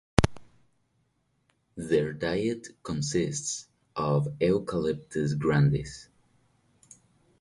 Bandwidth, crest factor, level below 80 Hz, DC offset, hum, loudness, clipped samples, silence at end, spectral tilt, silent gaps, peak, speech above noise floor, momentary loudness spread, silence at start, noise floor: 11.5 kHz; 30 dB; -46 dBFS; under 0.1%; none; -28 LUFS; under 0.1%; 1.35 s; -6 dB/octave; none; 0 dBFS; 45 dB; 13 LU; 0.2 s; -72 dBFS